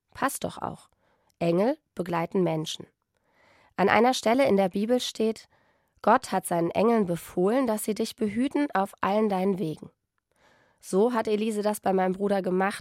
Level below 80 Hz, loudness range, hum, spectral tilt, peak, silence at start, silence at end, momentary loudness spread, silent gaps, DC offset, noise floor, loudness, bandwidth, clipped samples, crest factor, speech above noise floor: -66 dBFS; 4 LU; none; -5.5 dB/octave; -6 dBFS; 0.15 s; 0 s; 10 LU; none; under 0.1%; -69 dBFS; -26 LUFS; 16 kHz; under 0.1%; 22 dB; 43 dB